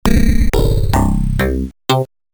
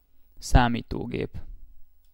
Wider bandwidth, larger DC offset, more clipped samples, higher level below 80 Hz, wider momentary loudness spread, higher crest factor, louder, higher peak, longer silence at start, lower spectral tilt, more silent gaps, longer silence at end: first, over 20 kHz vs 15.5 kHz; neither; neither; first, -16 dBFS vs -30 dBFS; second, 3 LU vs 16 LU; second, 14 dB vs 24 dB; first, -16 LUFS vs -26 LUFS; first, 0 dBFS vs -4 dBFS; second, 0.05 s vs 0.2 s; about the same, -6 dB/octave vs -6 dB/octave; neither; about the same, 0.3 s vs 0.3 s